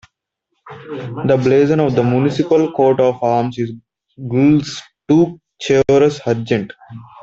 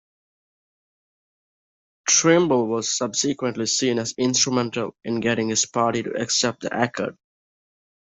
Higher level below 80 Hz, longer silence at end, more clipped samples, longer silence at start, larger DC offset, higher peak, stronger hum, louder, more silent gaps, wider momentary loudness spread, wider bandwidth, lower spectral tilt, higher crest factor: first, -52 dBFS vs -64 dBFS; second, 0.2 s vs 1.05 s; neither; second, 0.65 s vs 2.05 s; neither; about the same, -2 dBFS vs -4 dBFS; neither; first, -15 LUFS vs -21 LUFS; neither; first, 15 LU vs 9 LU; about the same, 8 kHz vs 8.2 kHz; first, -7 dB/octave vs -3 dB/octave; second, 14 dB vs 20 dB